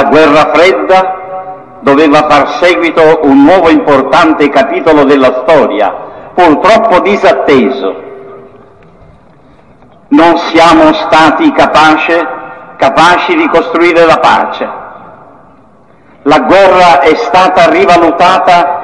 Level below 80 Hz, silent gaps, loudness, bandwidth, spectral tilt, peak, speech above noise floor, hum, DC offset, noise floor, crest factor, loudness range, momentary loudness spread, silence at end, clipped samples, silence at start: -38 dBFS; none; -6 LUFS; 11 kHz; -5 dB/octave; 0 dBFS; 36 dB; none; 0.7%; -41 dBFS; 6 dB; 4 LU; 12 LU; 0 s; 3%; 0 s